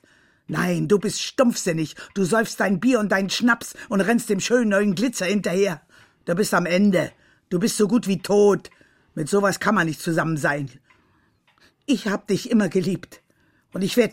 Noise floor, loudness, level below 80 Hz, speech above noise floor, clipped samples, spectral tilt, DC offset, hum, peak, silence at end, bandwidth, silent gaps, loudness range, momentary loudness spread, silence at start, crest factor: -63 dBFS; -22 LUFS; -62 dBFS; 42 dB; under 0.1%; -5 dB/octave; under 0.1%; none; -4 dBFS; 0 s; 16.5 kHz; none; 4 LU; 10 LU; 0.5 s; 18 dB